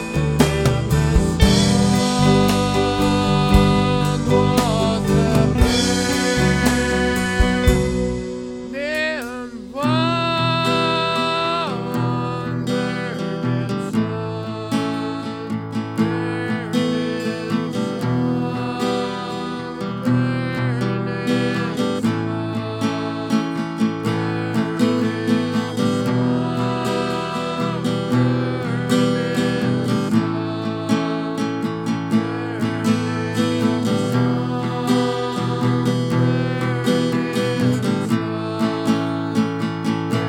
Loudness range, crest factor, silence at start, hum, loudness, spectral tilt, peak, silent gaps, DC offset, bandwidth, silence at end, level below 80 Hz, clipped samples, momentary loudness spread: 6 LU; 20 dB; 0 s; none; -20 LUFS; -6 dB/octave; 0 dBFS; none; under 0.1%; 18 kHz; 0 s; -32 dBFS; under 0.1%; 8 LU